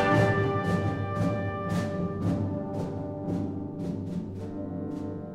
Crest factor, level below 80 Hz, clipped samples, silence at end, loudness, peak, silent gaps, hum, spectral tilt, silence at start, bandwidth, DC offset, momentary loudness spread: 18 dB; -52 dBFS; under 0.1%; 0 s; -30 LUFS; -10 dBFS; none; none; -8 dB/octave; 0 s; 12 kHz; under 0.1%; 9 LU